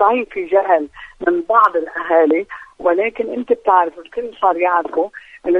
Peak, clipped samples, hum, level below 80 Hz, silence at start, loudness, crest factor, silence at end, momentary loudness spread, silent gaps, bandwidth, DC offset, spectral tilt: 0 dBFS; under 0.1%; none; -56 dBFS; 0 s; -17 LUFS; 16 dB; 0 s; 11 LU; none; 6 kHz; under 0.1%; -6 dB/octave